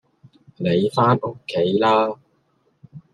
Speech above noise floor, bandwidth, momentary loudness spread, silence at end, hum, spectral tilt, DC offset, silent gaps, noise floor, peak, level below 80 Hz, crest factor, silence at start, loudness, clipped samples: 46 dB; 11.5 kHz; 9 LU; 0.15 s; none; -7.5 dB/octave; under 0.1%; none; -64 dBFS; -2 dBFS; -64 dBFS; 18 dB; 0.6 s; -20 LUFS; under 0.1%